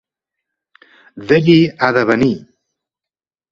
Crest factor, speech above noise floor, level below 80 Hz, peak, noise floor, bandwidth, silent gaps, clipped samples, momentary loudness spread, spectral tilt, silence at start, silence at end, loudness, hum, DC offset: 16 dB; 76 dB; -52 dBFS; 0 dBFS; -89 dBFS; 7.6 kHz; none; under 0.1%; 13 LU; -7.5 dB/octave; 1.15 s; 1.15 s; -13 LUFS; none; under 0.1%